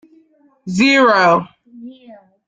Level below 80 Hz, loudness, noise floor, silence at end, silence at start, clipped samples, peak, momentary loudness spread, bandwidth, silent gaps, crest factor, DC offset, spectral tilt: -58 dBFS; -13 LUFS; -53 dBFS; 0.35 s; 0.65 s; under 0.1%; -2 dBFS; 23 LU; 9.2 kHz; none; 16 dB; under 0.1%; -5 dB/octave